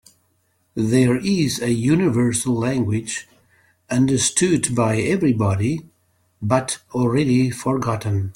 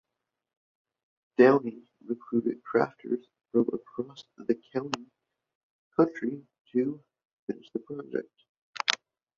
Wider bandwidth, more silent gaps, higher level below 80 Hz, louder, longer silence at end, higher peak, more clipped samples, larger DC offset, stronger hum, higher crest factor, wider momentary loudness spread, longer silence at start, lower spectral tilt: first, 16.5 kHz vs 7.6 kHz; second, none vs 5.55-5.91 s, 6.60-6.65 s, 7.25-7.47 s, 8.49-8.73 s; first, -52 dBFS vs -76 dBFS; first, -20 LUFS vs -30 LUFS; second, 0.05 s vs 0.45 s; about the same, -4 dBFS vs -2 dBFS; neither; neither; neither; second, 16 dB vs 28 dB; second, 8 LU vs 15 LU; second, 0.75 s vs 1.4 s; about the same, -5.5 dB/octave vs -5 dB/octave